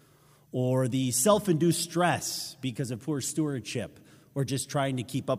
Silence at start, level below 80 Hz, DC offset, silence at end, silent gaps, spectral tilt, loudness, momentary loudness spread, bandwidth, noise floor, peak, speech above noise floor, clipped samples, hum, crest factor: 0.55 s; -68 dBFS; under 0.1%; 0 s; none; -4.5 dB/octave; -28 LUFS; 11 LU; 16 kHz; -60 dBFS; -10 dBFS; 32 dB; under 0.1%; none; 18 dB